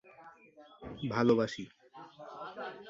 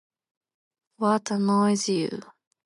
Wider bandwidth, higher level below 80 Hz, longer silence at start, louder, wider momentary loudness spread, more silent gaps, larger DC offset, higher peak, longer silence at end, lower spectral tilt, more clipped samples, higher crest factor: second, 7.8 kHz vs 11.5 kHz; first, -68 dBFS vs -74 dBFS; second, 0.2 s vs 1 s; second, -33 LUFS vs -24 LUFS; first, 25 LU vs 9 LU; neither; neither; second, -14 dBFS vs -10 dBFS; second, 0 s vs 0.45 s; first, -6.5 dB/octave vs -5 dB/octave; neither; about the same, 22 dB vs 18 dB